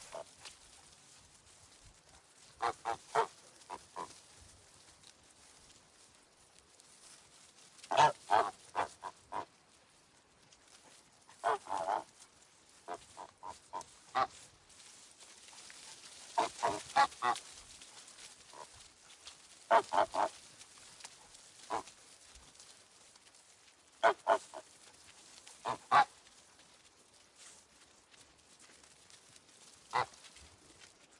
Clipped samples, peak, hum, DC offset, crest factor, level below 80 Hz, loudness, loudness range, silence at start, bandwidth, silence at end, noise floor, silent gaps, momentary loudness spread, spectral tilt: under 0.1%; -14 dBFS; none; under 0.1%; 26 dB; -76 dBFS; -35 LUFS; 14 LU; 0 s; 11.5 kHz; 0.95 s; -66 dBFS; none; 27 LU; -2 dB/octave